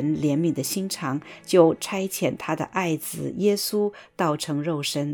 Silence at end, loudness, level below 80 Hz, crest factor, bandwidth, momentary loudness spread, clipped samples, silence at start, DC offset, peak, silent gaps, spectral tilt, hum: 0 s; -24 LUFS; -64 dBFS; 20 dB; 19 kHz; 9 LU; under 0.1%; 0 s; under 0.1%; -4 dBFS; none; -5 dB/octave; none